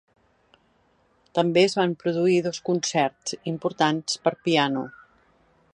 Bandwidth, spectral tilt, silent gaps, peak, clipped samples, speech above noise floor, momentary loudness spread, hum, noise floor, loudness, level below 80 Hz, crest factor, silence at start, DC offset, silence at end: 10.5 kHz; -4.5 dB/octave; none; -6 dBFS; under 0.1%; 41 dB; 10 LU; none; -64 dBFS; -24 LUFS; -68 dBFS; 20 dB; 1.35 s; under 0.1%; 0.85 s